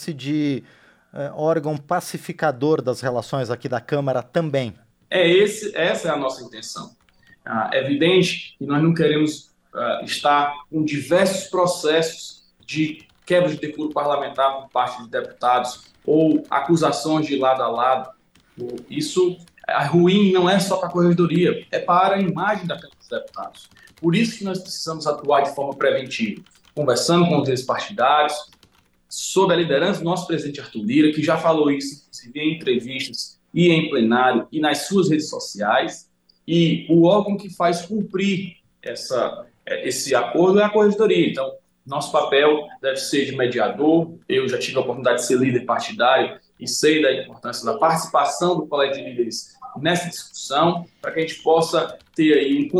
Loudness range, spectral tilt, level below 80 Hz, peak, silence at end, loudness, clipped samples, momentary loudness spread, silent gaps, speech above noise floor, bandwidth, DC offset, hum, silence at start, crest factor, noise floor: 4 LU; -5 dB/octave; -64 dBFS; -6 dBFS; 0 s; -20 LUFS; under 0.1%; 14 LU; none; 38 dB; 13 kHz; under 0.1%; none; 0 s; 16 dB; -58 dBFS